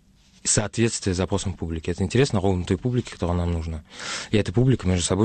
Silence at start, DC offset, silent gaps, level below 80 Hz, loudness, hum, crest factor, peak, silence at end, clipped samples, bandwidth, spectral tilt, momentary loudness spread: 0.45 s; under 0.1%; none; -40 dBFS; -24 LUFS; none; 16 dB; -8 dBFS; 0 s; under 0.1%; 9.4 kHz; -5 dB/octave; 9 LU